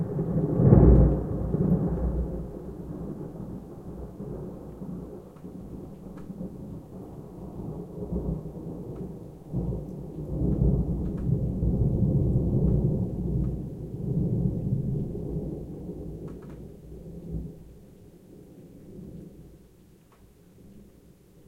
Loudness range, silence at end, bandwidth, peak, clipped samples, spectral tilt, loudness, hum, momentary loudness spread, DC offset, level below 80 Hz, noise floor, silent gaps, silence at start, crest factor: 17 LU; 0.65 s; 2.4 kHz; -4 dBFS; under 0.1%; -11.5 dB/octave; -28 LUFS; none; 19 LU; under 0.1%; -34 dBFS; -55 dBFS; none; 0 s; 24 dB